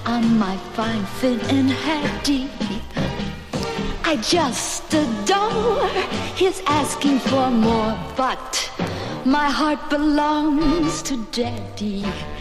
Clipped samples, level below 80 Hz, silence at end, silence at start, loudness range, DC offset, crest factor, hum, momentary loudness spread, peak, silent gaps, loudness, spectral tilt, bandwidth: under 0.1%; -38 dBFS; 0 s; 0 s; 3 LU; under 0.1%; 14 dB; none; 8 LU; -6 dBFS; none; -21 LUFS; -4.5 dB/octave; 15 kHz